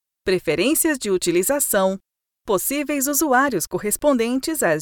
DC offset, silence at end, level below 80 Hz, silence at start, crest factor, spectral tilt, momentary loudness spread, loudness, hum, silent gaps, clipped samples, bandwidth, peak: under 0.1%; 0 s; -52 dBFS; 0.25 s; 16 dB; -3 dB/octave; 6 LU; -20 LUFS; none; none; under 0.1%; 19.5 kHz; -6 dBFS